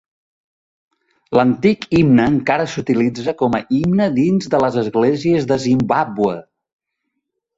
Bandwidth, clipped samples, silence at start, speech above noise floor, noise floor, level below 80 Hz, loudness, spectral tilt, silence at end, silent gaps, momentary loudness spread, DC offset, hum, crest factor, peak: 8 kHz; under 0.1%; 1.3 s; 60 dB; -75 dBFS; -48 dBFS; -16 LUFS; -7 dB/octave; 1.15 s; none; 6 LU; under 0.1%; none; 16 dB; -2 dBFS